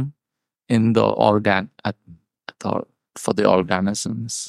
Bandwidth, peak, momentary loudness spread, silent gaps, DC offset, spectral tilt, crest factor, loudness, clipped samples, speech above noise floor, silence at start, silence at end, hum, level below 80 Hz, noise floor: 14 kHz; -2 dBFS; 17 LU; none; under 0.1%; -5.5 dB/octave; 20 dB; -20 LUFS; under 0.1%; 65 dB; 0 s; 0 s; none; -56 dBFS; -84 dBFS